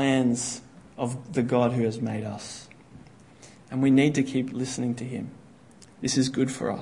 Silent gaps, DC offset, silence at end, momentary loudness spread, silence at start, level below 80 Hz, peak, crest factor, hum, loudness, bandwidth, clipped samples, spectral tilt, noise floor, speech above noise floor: none; under 0.1%; 0 s; 16 LU; 0 s; -62 dBFS; -10 dBFS; 18 dB; none; -26 LUFS; 11 kHz; under 0.1%; -5.5 dB/octave; -52 dBFS; 26 dB